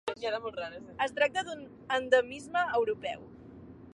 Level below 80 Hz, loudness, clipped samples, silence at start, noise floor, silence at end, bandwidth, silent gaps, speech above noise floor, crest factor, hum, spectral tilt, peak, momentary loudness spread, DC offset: -64 dBFS; -31 LUFS; under 0.1%; 0.05 s; -50 dBFS; 0.05 s; 11 kHz; none; 18 dB; 22 dB; none; -3.5 dB/octave; -10 dBFS; 20 LU; under 0.1%